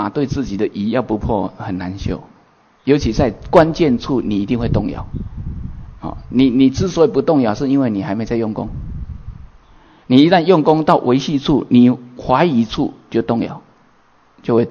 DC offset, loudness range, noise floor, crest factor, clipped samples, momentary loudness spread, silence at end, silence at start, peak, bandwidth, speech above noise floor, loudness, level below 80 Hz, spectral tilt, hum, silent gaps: under 0.1%; 4 LU; -52 dBFS; 16 dB; under 0.1%; 17 LU; 0 s; 0 s; 0 dBFS; 7 kHz; 37 dB; -16 LUFS; -34 dBFS; -7 dB/octave; none; none